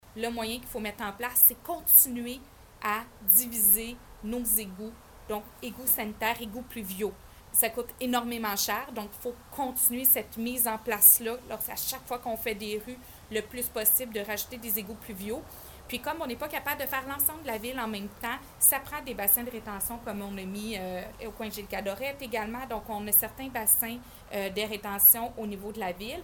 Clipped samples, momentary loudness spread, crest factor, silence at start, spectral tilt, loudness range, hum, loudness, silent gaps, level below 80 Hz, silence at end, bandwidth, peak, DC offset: under 0.1%; 18 LU; 26 dB; 0.05 s; -2 dB/octave; 9 LU; none; -26 LUFS; none; -54 dBFS; 0 s; 19 kHz; -4 dBFS; under 0.1%